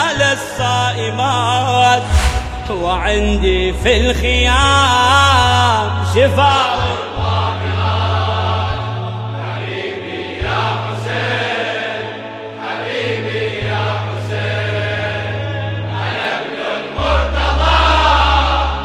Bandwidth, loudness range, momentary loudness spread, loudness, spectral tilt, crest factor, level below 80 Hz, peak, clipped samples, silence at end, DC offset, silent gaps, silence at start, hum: 14 kHz; 8 LU; 11 LU; -15 LUFS; -4.5 dB/octave; 16 dB; -24 dBFS; 0 dBFS; under 0.1%; 0 s; under 0.1%; none; 0 s; none